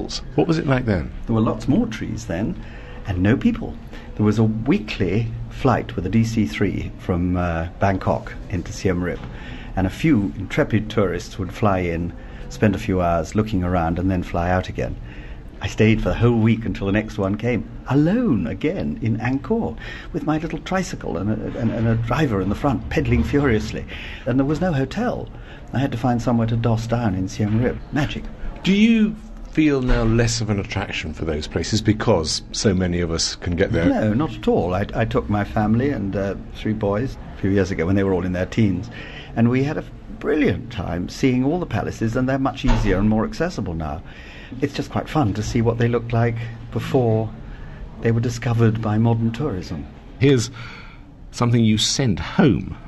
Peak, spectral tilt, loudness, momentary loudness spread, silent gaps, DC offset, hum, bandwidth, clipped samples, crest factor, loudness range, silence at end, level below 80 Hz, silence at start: -4 dBFS; -6.5 dB/octave; -21 LUFS; 11 LU; none; under 0.1%; none; 12.5 kHz; under 0.1%; 18 dB; 3 LU; 0 s; -34 dBFS; 0 s